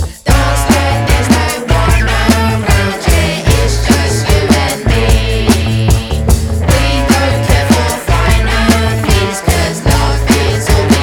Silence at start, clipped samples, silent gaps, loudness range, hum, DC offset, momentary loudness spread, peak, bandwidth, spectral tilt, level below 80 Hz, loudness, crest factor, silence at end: 0 s; 0.3%; none; 1 LU; none; under 0.1%; 2 LU; 0 dBFS; 19 kHz; -5 dB/octave; -16 dBFS; -11 LUFS; 10 dB; 0 s